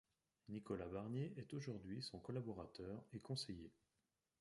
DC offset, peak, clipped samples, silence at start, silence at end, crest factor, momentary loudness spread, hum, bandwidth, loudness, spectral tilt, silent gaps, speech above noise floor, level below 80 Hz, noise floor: under 0.1%; -34 dBFS; under 0.1%; 0.45 s; 0.7 s; 18 dB; 7 LU; none; 11.5 kHz; -50 LUFS; -6 dB/octave; none; 40 dB; -72 dBFS; -90 dBFS